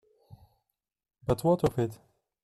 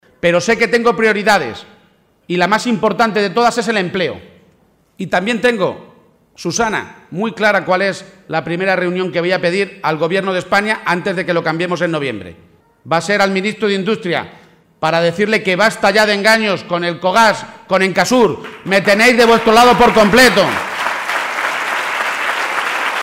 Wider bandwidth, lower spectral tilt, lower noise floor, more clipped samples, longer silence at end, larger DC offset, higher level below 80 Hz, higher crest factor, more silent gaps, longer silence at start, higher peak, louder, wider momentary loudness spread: second, 14 kHz vs 16 kHz; first, -7.5 dB/octave vs -4 dB/octave; first, -85 dBFS vs -54 dBFS; neither; first, 0.5 s vs 0 s; neither; second, -54 dBFS vs -48 dBFS; about the same, 18 dB vs 14 dB; neither; first, 1.3 s vs 0.25 s; second, -14 dBFS vs -2 dBFS; second, -29 LUFS vs -14 LUFS; second, 9 LU vs 12 LU